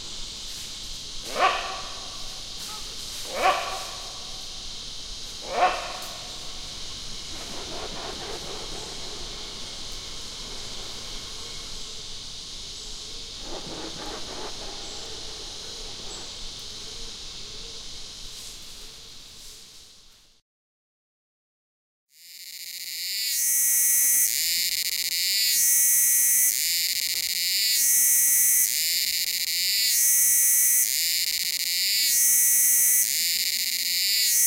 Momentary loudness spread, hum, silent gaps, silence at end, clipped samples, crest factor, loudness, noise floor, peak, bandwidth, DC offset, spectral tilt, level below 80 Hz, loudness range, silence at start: 19 LU; none; 20.42-22.07 s; 0 s; under 0.1%; 20 dB; -20 LUFS; -53 dBFS; -8 dBFS; 17 kHz; under 0.1%; 1.5 dB/octave; -46 dBFS; 18 LU; 0 s